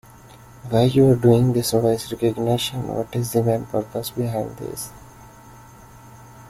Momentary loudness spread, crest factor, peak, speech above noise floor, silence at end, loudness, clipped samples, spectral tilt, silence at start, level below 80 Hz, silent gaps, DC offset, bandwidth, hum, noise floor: 15 LU; 18 dB; -2 dBFS; 25 dB; 0 s; -21 LUFS; under 0.1%; -6.5 dB/octave; 0.25 s; -50 dBFS; none; under 0.1%; 15.5 kHz; none; -45 dBFS